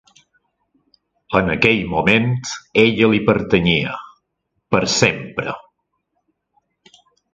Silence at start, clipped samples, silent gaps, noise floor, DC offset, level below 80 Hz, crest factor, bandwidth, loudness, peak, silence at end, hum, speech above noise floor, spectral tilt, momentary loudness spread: 1.3 s; under 0.1%; none; -73 dBFS; under 0.1%; -46 dBFS; 20 dB; 9.4 kHz; -17 LUFS; 0 dBFS; 1.75 s; none; 56 dB; -4.5 dB/octave; 11 LU